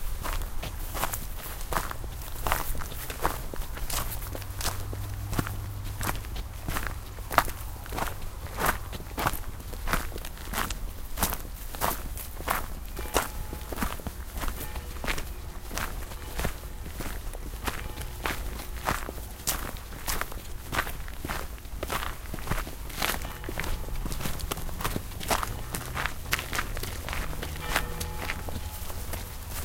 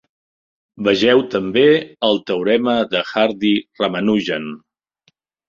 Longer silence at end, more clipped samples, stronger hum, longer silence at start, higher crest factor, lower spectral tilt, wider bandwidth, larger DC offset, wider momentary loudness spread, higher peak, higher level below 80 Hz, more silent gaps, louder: second, 0 s vs 0.9 s; neither; neither; second, 0 s vs 0.75 s; first, 32 dB vs 16 dB; second, -3.5 dB/octave vs -6 dB/octave; first, 17 kHz vs 7.4 kHz; neither; about the same, 9 LU vs 8 LU; about the same, 0 dBFS vs -2 dBFS; first, -36 dBFS vs -58 dBFS; neither; second, -33 LUFS vs -17 LUFS